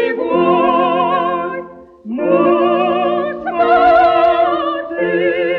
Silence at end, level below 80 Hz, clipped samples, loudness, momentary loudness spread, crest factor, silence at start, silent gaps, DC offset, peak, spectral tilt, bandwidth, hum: 0 s; -50 dBFS; under 0.1%; -14 LUFS; 10 LU; 12 dB; 0 s; none; under 0.1%; -2 dBFS; -8 dB/octave; 5.2 kHz; none